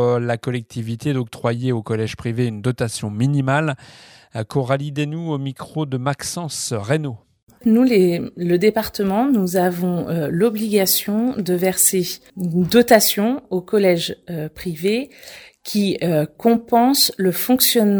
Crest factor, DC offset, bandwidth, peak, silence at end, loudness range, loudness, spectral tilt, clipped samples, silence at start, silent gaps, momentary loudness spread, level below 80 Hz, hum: 18 dB; under 0.1%; over 20 kHz; 0 dBFS; 0 s; 6 LU; -19 LUFS; -4.5 dB/octave; under 0.1%; 0 s; 7.43-7.47 s; 12 LU; -54 dBFS; none